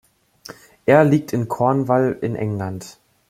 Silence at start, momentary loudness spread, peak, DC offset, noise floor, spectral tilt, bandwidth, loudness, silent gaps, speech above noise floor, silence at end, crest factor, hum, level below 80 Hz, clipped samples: 0.5 s; 25 LU; -2 dBFS; under 0.1%; -43 dBFS; -7.5 dB/octave; 15.5 kHz; -19 LUFS; none; 25 dB; 0.4 s; 18 dB; none; -58 dBFS; under 0.1%